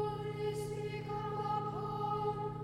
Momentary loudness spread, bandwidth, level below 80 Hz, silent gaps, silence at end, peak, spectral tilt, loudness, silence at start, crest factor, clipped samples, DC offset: 4 LU; 15.5 kHz; -60 dBFS; none; 0 s; -24 dBFS; -7 dB/octave; -38 LUFS; 0 s; 14 dB; under 0.1%; under 0.1%